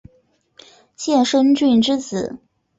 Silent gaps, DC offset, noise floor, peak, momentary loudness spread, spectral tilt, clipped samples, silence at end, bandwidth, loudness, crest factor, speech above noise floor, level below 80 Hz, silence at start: none; under 0.1%; -60 dBFS; -6 dBFS; 13 LU; -4.5 dB/octave; under 0.1%; 0.45 s; 8 kHz; -17 LUFS; 14 dB; 43 dB; -58 dBFS; 1 s